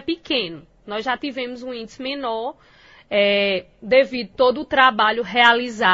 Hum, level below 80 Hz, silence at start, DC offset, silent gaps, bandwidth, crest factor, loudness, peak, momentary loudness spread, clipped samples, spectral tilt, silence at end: none; -56 dBFS; 0.05 s; under 0.1%; none; 8 kHz; 20 dB; -19 LUFS; 0 dBFS; 15 LU; under 0.1%; -4 dB/octave; 0 s